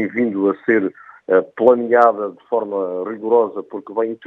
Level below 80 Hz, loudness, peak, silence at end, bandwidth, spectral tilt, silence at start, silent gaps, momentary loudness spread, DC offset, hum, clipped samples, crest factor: -76 dBFS; -18 LUFS; 0 dBFS; 0 s; 3.9 kHz; -9 dB/octave; 0 s; none; 12 LU; under 0.1%; none; under 0.1%; 18 dB